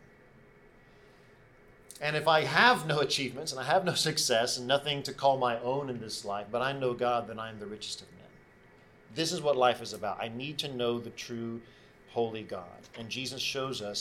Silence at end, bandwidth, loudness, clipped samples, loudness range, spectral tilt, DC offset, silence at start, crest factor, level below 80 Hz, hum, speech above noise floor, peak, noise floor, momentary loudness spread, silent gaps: 0 s; 18 kHz; -30 LUFS; under 0.1%; 9 LU; -3 dB/octave; under 0.1%; 1.9 s; 24 dB; -66 dBFS; none; 27 dB; -8 dBFS; -58 dBFS; 14 LU; none